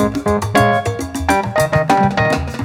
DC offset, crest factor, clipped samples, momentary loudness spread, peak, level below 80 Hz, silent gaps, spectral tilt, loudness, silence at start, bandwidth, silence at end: under 0.1%; 14 dB; under 0.1%; 5 LU; 0 dBFS; -34 dBFS; none; -5.5 dB/octave; -15 LUFS; 0 s; 18 kHz; 0 s